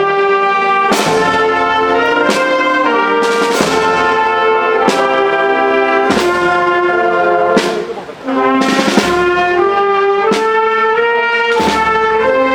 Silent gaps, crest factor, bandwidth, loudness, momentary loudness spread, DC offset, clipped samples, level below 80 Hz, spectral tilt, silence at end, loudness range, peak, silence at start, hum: none; 12 dB; 19 kHz; -12 LUFS; 1 LU; under 0.1%; under 0.1%; -44 dBFS; -4 dB/octave; 0 s; 1 LU; 0 dBFS; 0 s; none